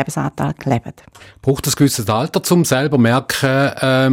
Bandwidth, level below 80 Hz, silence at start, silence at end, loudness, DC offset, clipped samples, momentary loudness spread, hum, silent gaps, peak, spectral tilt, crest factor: 16.5 kHz; -48 dBFS; 0 s; 0 s; -16 LUFS; under 0.1%; under 0.1%; 7 LU; none; none; -4 dBFS; -5 dB/octave; 12 dB